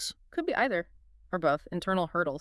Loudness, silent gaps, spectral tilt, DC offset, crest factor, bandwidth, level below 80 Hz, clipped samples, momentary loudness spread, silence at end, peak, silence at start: -30 LUFS; none; -5 dB/octave; under 0.1%; 18 dB; 12 kHz; -58 dBFS; under 0.1%; 7 LU; 0 s; -12 dBFS; 0 s